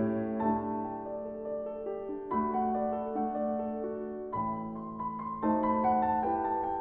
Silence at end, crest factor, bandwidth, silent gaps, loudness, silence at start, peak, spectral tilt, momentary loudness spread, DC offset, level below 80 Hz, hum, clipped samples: 0 s; 14 dB; 3.8 kHz; none; -33 LUFS; 0 s; -18 dBFS; -8 dB/octave; 10 LU; under 0.1%; -60 dBFS; none; under 0.1%